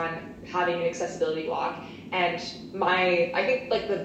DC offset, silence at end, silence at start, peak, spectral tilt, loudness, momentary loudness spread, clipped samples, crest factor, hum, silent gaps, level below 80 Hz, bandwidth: under 0.1%; 0 s; 0 s; -10 dBFS; -4.5 dB/octave; -27 LUFS; 10 LU; under 0.1%; 16 dB; none; none; -60 dBFS; 8.6 kHz